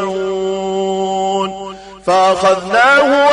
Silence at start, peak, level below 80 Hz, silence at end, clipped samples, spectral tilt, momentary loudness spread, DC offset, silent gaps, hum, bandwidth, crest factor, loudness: 0 s; -2 dBFS; -50 dBFS; 0 s; under 0.1%; -4 dB/octave; 13 LU; under 0.1%; none; none; 11 kHz; 12 dB; -14 LUFS